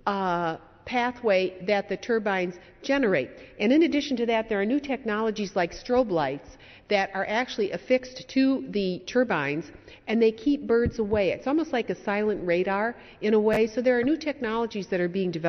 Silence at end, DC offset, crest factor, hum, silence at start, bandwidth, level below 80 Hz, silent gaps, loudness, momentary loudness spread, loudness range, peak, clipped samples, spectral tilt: 0 s; under 0.1%; 16 dB; none; 0.05 s; 6.4 kHz; -52 dBFS; none; -26 LUFS; 6 LU; 2 LU; -10 dBFS; under 0.1%; -4 dB/octave